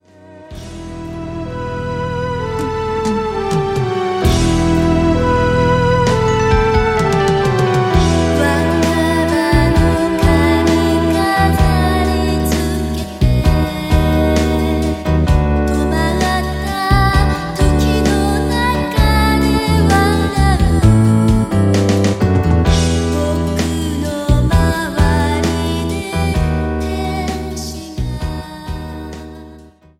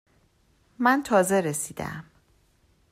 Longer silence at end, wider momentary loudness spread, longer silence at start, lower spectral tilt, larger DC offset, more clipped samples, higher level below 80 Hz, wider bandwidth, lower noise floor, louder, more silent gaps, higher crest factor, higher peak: second, 0.35 s vs 0.9 s; second, 11 LU vs 15 LU; second, 0.3 s vs 0.8 s; first, -6 dB/octave vs -4.5 dB/octave; neither; neither; first, -20 dBFS vs -60 dBFS; about the same, 16 kHz vs 16 kHz; second, -40 dBFS vs -64 dBFS; first, -15 LUFS vs -24 LUFS; neither; second, 14 dB vs 20 dB; first, 0 dBFS vs -8 dBFS